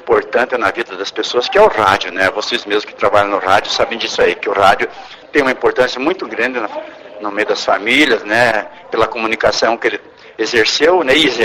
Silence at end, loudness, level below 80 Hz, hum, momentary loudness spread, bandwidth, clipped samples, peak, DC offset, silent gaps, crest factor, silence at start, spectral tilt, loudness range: 0 s; -14 LUFS; -46 dBFS; none; 11 LU; 15.5 kHz; under 0.1%; 0 dBFS; under 0.1%; none; 14 dB; 0 s; -3 dB/octave; 2 LU